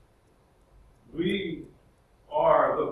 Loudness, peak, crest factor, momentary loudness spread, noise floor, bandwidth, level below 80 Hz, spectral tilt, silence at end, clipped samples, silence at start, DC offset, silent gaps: -26 LUFS; -8 dBFS; 22 dB; 18 LU; -62 dBFS; 11.5 kHz; -58 dBFS; -7.5 dB/octave; 0 s; under 0.1%; 1.15 s; under 0.1%; none